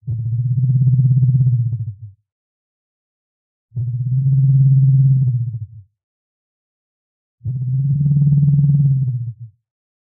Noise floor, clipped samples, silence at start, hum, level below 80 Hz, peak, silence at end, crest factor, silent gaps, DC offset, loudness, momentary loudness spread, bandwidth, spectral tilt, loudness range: under -90 dBFS; under 0.1%; 0.05 s; none; -46 dBFS; -6 dBFS; 0.65 s; 12 dB; 2.32-3.69 s, 6.04-7.38 s; under 0.1%; -16 LUFS; 14 LU; 0.6 kHz; -22 dB/octave; 4 LU